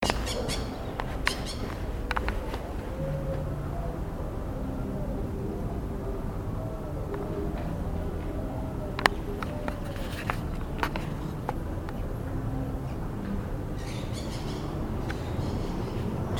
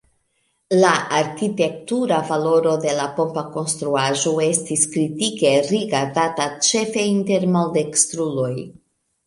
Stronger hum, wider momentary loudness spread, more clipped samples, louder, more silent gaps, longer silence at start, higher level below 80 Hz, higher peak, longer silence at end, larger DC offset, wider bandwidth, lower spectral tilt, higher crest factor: neither; about the same, 5 LU vs 6 LU; neither; second, -33 LUFS vs -19 LUFS; neither; second, 0 s vs 0.7 s; first, -36 dBFS vs -64 dBFS; about the same, 0 dBFS vs -2 dBFS; second, 0 s vs 0.55 s; neither; first, 19 kHz vs 11.5 kHz; first, -5.5 dB/octave vs -3.5 dB/octave; first, 32 dB vs 18 dB